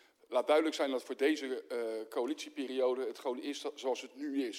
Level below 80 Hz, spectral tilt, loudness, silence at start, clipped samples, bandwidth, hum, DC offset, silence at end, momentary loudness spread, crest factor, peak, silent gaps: under -90 dBFS; -2 dB/octave; -35 LUFS; 0.3 s; under 0.1%; 16 kHz; none; under 0.1%; 0 s; 9 LU; 20 dB; -16 dBFS; none